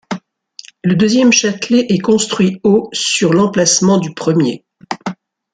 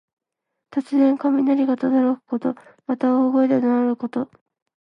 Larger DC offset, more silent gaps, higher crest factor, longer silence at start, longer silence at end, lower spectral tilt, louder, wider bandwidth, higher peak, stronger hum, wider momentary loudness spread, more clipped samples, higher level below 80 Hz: neither; neither; about the same, 14 dB vs 14 dB; second, 0.1 s vs 0.7 s; second, 0.4 s vs 0.55 s; second, -4 dB/octave vs -8 dB/octave; first, -13 LUFS vs -20 LUFS; first, 9.6 kHz vs 5.4 kHz; first, 0 dBFS vs -6 dBFS; neither; first, 15 LU vs 11 LU; neither; first, -54 dBFS vs -72 dBFS